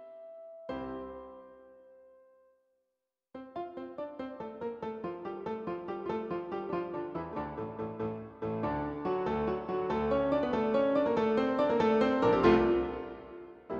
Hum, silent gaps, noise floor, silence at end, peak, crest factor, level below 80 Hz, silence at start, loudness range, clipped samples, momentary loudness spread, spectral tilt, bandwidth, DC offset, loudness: none; none; -86 dBFS; 0 s; -12 dBFS; 20 dB; -56 dBFS; 0 s; 19 LU; under 0.1%; 19 LU; -8 dB/octave; 7.2 kHz; under 0.1%; -32 LUFS